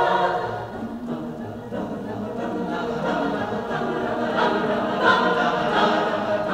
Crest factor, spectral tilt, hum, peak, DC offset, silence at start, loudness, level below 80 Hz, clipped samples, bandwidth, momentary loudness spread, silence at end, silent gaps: 18 dB; -6 dB/octave; none; -4 dBFS; under 0.1%; 0 s; -23 LUFS; -52 dBFS; under 0.1%; 15.5 kHz; 12 LU; 0 s; none